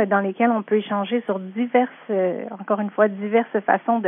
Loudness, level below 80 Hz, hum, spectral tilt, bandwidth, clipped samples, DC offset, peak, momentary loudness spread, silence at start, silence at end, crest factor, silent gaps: -22 LUFS; -84 dBFS; none; -10.5 dB/octave; 3.8 kHz; under 0.1%; under 0.1%; -2 dBFS; 6 LU; 0 s; 0 s; 18 dB; none